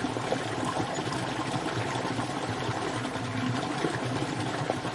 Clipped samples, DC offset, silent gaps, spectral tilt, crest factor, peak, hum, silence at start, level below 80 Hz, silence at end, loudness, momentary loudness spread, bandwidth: under 0.1%; under 0.1%; none; -5 dB/octave; 20 dB; -10 dBFS; none; 0 s; -58 dBFS; 0 s; -31 LUFS; 1 LU; 11.5 kHz